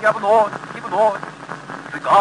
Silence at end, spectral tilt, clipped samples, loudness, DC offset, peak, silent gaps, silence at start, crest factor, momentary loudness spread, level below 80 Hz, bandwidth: 0 s; -4.5 dB/octave; under 0.1%; -18 LUFS; under 0.1%; -4 dBFS; none; 0 s; 14 dB; 16 LU; -60 dBFS; 10.5 kHz